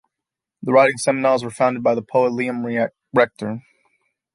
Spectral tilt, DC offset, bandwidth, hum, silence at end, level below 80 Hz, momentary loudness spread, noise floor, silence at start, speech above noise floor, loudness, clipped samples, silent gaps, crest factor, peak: -5.5 dB/octave; under 0.1%; 11.5 kHz; none; 0.75 s; -66 dBFS; 13 LU; -85 dBFS; 0.6 s; 67 dB; -19 LUFS; under 0.1%; none; 18 dB; -2 dBFS